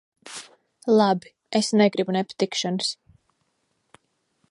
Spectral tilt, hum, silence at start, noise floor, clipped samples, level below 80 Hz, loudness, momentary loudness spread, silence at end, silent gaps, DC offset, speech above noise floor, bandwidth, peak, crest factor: -4.5 dB/octave; none; 0.25 s; -72 dBFS; under 0.1%; -72 dBFS; -23 LUFS; 19 LU; 1.55 s; none; under 0.1%; 51 dB; 11.5 kHz; -6 dBFS; 20 dB